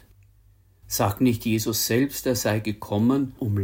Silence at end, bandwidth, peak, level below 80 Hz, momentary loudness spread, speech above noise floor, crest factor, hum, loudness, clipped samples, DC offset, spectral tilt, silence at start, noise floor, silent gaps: 0 s; 17 kHz; -8 dBFS; -52 dBFS; 5 LU; 34 dB; 16 dB; none; -24 LUFS; under 0.1%; under 0.1%; -5 dB/octave; 0.9 s; -57 dBFS; none